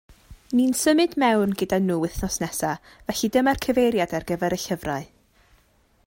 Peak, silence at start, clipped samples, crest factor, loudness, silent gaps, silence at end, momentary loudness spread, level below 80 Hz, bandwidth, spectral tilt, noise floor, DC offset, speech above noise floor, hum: -8 dBFS; 0.3 s; under 0.1%; 16 dB; -23 LUFS; none; 1 s; 9 LU; -46 dBFS; 16.5 kHz; -4.5 dB/octave; -61 dBFS; under 0.1%; 39 dB; none